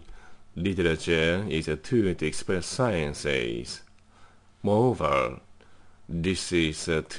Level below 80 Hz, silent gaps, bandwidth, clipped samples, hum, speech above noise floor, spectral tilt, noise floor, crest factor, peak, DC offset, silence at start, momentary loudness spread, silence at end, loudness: -48 dBFS; none; 10.5 kHz; under 0.1%; none; 27 dB; -5 dB/octave; -54 dBFS; 16 dB; -12 dBFS; under 0.1%; 0 s; 10 LU; 0 s; -27 LUFS